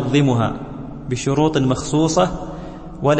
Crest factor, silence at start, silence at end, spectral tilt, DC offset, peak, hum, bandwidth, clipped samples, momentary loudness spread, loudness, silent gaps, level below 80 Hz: 16 dB; 0 s; 0 s; -6 dB/octave; under 0.1%; -4 dBFS; none; 8.8 kHz; under 0.1%; 15 LU; -19 LUFS; none; -38 dBFS